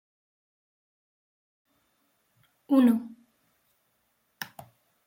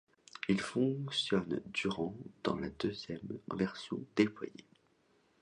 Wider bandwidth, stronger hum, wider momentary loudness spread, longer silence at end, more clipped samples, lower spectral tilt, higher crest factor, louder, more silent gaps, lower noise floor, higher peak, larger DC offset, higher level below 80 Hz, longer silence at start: first, 16.5 kHz vs 11 kHz; neither; first, 20 LU vs 10 LU; second, 0.65 s vs 0.8 s; neither; about the same, -6 dB/octave vs -5.5 dB/octave; about the same, 22 dB vs 22 dB; first, -24 LUFS vs -36 LUFS; neither; about the same, -73 dBFS vs -72 dBFS; about the same, -12 dBFS vs -14 dBFS; neither; second, -78 dBFS vs -66 dBFS; first, 2.7 s vs 0.35 s